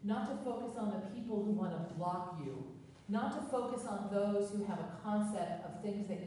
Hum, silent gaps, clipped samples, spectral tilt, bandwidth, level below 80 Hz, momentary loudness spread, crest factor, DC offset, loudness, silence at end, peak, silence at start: none; none; under 0.1%; -7 dB/octave; 11.5 kHz; -74 dBFS; 7 LU; 14 dB; under 0.1%; -39 LUFS; 0 s; -24 dBFS; 0 s